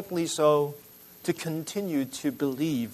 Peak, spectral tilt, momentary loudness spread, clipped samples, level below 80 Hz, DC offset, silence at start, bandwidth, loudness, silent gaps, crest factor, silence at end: -10 dBFS; -5 dB/octave; 10 LU; under 0.1%; -70 dBFS; under 0.1%; 0 s; 13.5 kHz; -28 LUFS; none; 18 dB; 0 s